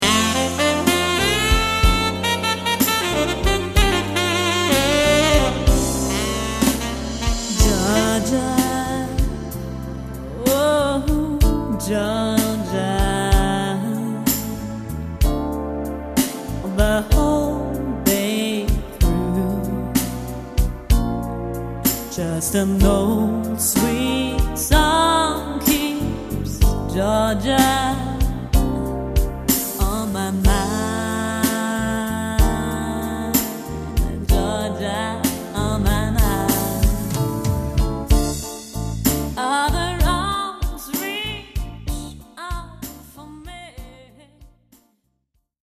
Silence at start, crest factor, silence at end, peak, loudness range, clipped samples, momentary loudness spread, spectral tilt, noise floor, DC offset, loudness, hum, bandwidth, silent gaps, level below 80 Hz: 0 s; 18 dB; 1.2 s; -2 dBFS; 5 LU; under 0.1%; 11 LU; -4.5 dB/octave; -70 dBFS; under 0.1%; -20 LUFS; none; 14 kHz; none; -26 dBFS